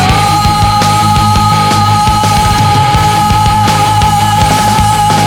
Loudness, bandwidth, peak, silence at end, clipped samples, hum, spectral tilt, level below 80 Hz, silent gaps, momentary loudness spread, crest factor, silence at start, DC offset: -8 LUFS; 19 kHz; 0 dBFS; 0 s; 0.2%; none; -4.5 dB/octave; -22 dBFS; none; 1 LU; 8 dB; 0 s; under 0.1%